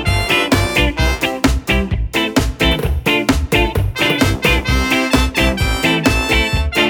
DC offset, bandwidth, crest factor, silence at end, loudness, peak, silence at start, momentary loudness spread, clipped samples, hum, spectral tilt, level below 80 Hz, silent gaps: under 0.1%; over 20 kHz; 14 dB; 0 s; -15 LUFS; 0 dBFS; 0 s; 3 LU; under 0.1%; none; -4.5 dB/octave; -22 dBFS; none